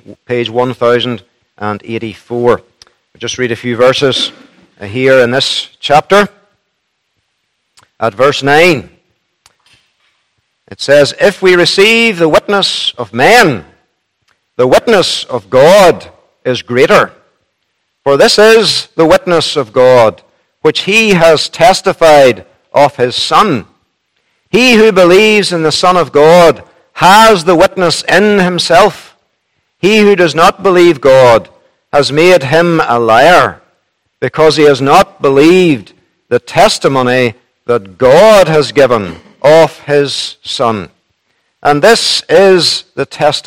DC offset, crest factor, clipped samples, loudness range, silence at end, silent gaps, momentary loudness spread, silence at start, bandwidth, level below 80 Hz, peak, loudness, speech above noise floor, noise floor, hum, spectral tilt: under 0.1%; 10 dB; 3%; 6 LU; 0.05 s; none; 12 LU; 0.1 s; 17 kHz; -42 dBFS; 0 dBFS; -8 LUFS; 57 dB; -65 dBFS; none; -4 dB/octave